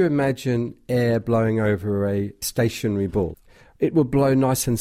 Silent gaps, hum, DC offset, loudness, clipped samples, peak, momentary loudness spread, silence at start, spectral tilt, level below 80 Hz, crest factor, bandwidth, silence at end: none; none; under 0.1%; -22 LUFS; under 0.1%; -8 dBFS; 7 LU; 0 s; -6 dB/octave; -46 dBFS; 12 dB; 16 kHz; 0 s